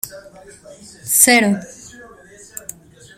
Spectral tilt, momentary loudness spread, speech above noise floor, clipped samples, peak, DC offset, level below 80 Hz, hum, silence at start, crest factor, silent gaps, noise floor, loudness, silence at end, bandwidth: -2 dB/octave; 25 LU; 25 dB; under 0.1%; 0 dBFS; under 0.1%; -58 dBFS; none; 0.05 s; 20 dB; none; -43 dBFS; -13 LUFS; 1.3 s; 16.5 kHz